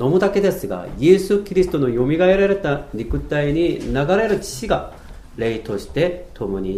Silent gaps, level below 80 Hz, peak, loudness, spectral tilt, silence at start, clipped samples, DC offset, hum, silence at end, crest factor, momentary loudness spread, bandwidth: none; -36 dBFS; 0 dBFS; -19 LUFS; -6.5 dB/octave; 0 s; under 0.1%; under 0.1%; none; 0 s; 18 dB; 11 LU; 15 kHz